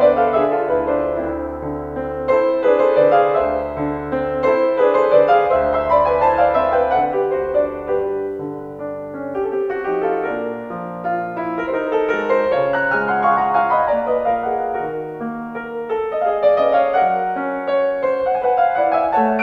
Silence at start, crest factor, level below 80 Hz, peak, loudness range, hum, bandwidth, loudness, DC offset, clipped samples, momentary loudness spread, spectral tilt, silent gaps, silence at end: 0 s; 16 dB; -46 dBFS; -2 dBFS; 6 LU; none; 6.2 kHz; -18 LUFS; under 0.1%; under 0.1%; 11 LU; -7.5 dB/octave; none; 0 s